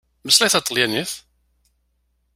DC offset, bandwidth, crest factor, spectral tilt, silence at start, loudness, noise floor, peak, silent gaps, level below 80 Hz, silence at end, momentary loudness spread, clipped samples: under 0.1%; 16 kHz; 22 dB; -1 dB/octave; 0.25 s; -17 LUFS; -68 dBFS; 0 dBFS; none; -62 dBFS; 1.15 s; 15 LU; under 0.1%